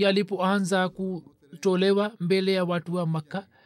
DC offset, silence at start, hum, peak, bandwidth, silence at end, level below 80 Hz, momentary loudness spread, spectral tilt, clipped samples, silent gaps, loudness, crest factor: under 0.1%; 0 s; none; -12 dBFS; 13 kHz; 0.25 s; -72 dBFS; 10 LU; -6 dB/octave; under 0.1%; none; -26 LUFS; 14 dB